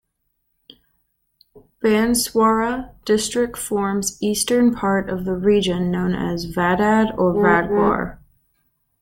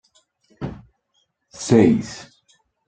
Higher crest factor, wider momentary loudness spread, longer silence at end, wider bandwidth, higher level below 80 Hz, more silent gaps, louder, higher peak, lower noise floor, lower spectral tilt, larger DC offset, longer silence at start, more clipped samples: about the same, 18 dB vs 20 dB; second, 7 LU vs 20 LU; first, 0.85 s vs 0.65 s; first, 17 kHz vs 9.2 kHz; first, -44 dBFS vs -52 dBFS; neither; about the same, -19 LUFS vs -18 LUFS; about the same, -2 dBFS vs -2 dBFS; about the same, -72 dBFS vs -69 dBFS; second, -4.5 dB/octave vs -6.5 dB/octave; neither; first, 1.55 s vs 0.6 s; neither